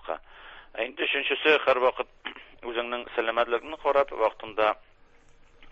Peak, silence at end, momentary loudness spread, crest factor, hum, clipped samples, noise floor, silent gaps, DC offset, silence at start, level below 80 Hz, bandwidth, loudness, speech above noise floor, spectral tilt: -8 dBFS; 0 s; 18 LU; 20 dB; none; under 0.1%; -55 dBFS; none; under 0.1%; 0.05 s; -60 dBFS; 7.6 kHz; -26 LUFS; 29 dB; -4 dB/octave